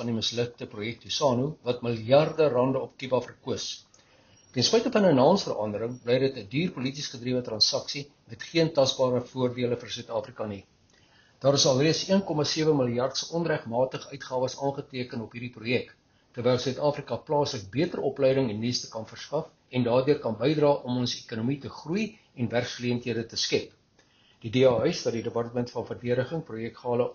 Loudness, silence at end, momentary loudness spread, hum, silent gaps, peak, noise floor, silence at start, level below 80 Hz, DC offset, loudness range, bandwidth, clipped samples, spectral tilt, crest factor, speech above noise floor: -27 LUFS; 0 s; 13 LU; none; none; -8 dBFS; -63 dBFS; 0 s; -64 dBFS; under 0.1%; 4 LU; 7.2 kHz; under 0.1%; -4.5 dB/octave; 20 dB; 36 dB